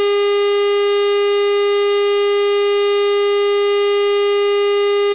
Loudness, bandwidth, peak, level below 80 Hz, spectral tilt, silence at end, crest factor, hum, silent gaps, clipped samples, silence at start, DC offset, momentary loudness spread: -15 LUFS; 3.9 kHz; -10 dBFS; -70 dBFS; -4.5 dB/octave; 0 s; 4 dB; none; none; under 0.1%; 0 s; 0.3%; 0 LU